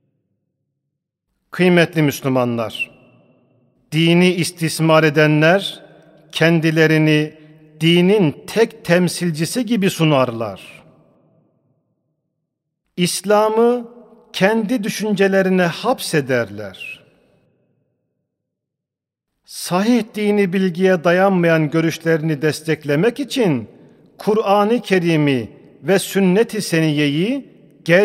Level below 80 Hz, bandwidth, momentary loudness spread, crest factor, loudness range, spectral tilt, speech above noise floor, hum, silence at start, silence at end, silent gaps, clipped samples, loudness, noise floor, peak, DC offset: -64 dBFS; 16 kHz; 13 LU; 18 dB; 7 LU; -5.5 dB/octave; 68 dB; none; 1.55 s; 0 s; none; under 0.1%; -17 LUFS; -84 dBFS; 0 dBFS; under 0.1%